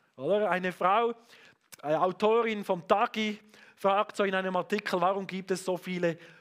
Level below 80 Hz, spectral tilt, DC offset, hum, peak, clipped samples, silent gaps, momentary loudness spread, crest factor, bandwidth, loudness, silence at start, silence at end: -78 dBFS; -5.5 dB/octave; under 0.1%; none; -10 dBFS; under 0.1%; none; 7 LU; 20 dB; 15.5 kHz; -29 LUFS; 0.2 s; 0.15 s